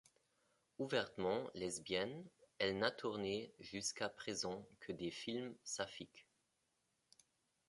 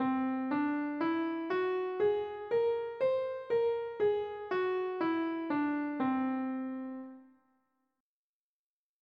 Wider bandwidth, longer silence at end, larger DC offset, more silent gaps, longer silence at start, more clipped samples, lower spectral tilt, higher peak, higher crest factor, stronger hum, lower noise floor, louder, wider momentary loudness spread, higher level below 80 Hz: first, 11.5 kHz vs 5.6 kHz; second, 1.45 s vs 1.8 s; neither; neither; first, 0.8 s vs 0 s; neither; second, -3 dB/octave vs -7.5 dB/octave; about the same, -22 dBFS vs -22 dBFS; first, 24 dB vs 12 dB; neither; second, -85 dBFS vs under -90 dBFS; second, -43 LUFS vs -33 LUFS; first, 11 LU vs 5 LU; about the same, -76 dBFS vs -78 dBFS